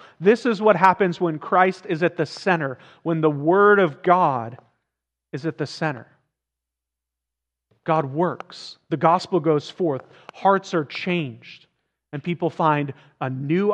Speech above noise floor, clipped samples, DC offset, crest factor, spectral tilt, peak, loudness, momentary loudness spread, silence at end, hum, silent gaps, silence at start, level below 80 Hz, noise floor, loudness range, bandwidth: 64 dB; under 0.1%; under 0.1%; 22 dB; -7 dB/octave; 0 dBFS; -21 LUFS; 15 LU; 0 s; none; none; 0.2 s; -74 dBFS; -85 dBFS; 9 LU; 9.4 kHz